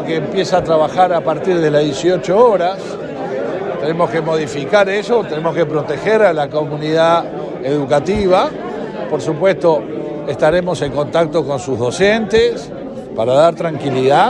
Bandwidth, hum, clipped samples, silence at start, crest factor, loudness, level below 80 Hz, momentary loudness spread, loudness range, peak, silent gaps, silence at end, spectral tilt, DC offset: 10.5 kHz; none; under 0.1%; 0 s; 14 dB; -15 LUFS; -44 dBFS; 10 LU; 2 LU; 0 dBFS; none; 0 s; -6 dB/octave; under 0.1%